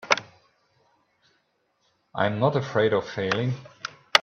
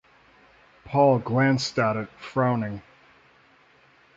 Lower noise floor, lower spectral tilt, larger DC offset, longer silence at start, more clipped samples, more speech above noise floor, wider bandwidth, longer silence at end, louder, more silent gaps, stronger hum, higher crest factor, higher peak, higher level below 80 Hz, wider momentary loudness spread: first, -71 dBFS vs -58 dBFS; second, -4.5 dB/octave vs -6.5 dB/octave; neither; second, 0.05 s vs 0.85 s; neither; first, 46 dB vs 35 dB; first, 14.5 kHz vs 7.8 kHz; second, 0 s vs 1.35 s; about the same, -25 LUFS vs -24 LUFS; neither; neither; first, 28 dB vs 20 dB; first, 0 dBFS vs -8 dBFS; second, -66 dBFS vs -60 dBFS; first, 15 LU vs 11 LU